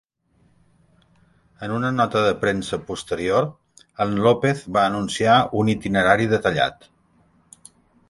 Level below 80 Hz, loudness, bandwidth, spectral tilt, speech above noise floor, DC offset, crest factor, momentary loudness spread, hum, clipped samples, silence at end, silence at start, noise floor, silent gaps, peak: -52 dBFS; -21 LUFS; 11.5 kHz; -5.5 dB/octave; 41 dB; under 0.1%; 20 dB; 11 LU; none; under 0.1%; 1.35 s; 1.6 s; -62 dBFS; none; -2 dBFS